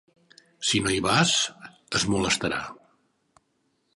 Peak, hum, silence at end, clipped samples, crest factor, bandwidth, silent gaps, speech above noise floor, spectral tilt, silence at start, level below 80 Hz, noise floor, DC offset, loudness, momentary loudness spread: -6 dBFS; none; 1.2 s; under 0.1%; 22 dB; 11.5 kHz; none; 47 dB; -3 dB/octave; 0.6 s; -52 dBFS; -72 dBFS; under 0.1%; -24 LUFS; 9 LU